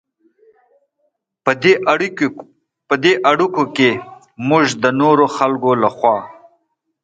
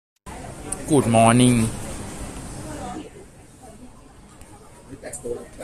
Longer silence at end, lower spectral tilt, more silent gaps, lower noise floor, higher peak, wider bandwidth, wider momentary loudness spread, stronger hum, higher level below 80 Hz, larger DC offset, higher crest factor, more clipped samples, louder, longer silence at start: first, 0.7 s vs 0 s; about the same, -5 dB/octave vs -5.5 dB/octave; neither; first, -68 dBFS vs -46 dBFS; about the same, 0 dBFS vs -2 dBFS; second, 9.2 kHz vs 14 kHz; second, 8 LU vs 23 LU; neither; second, -62 dBFS vs -42 dBFS; neither; second, 16 dB vs 22 dB; neither; first, -15 LUFS vs -21 LUFS; first, 1.45 s vs 0.25 s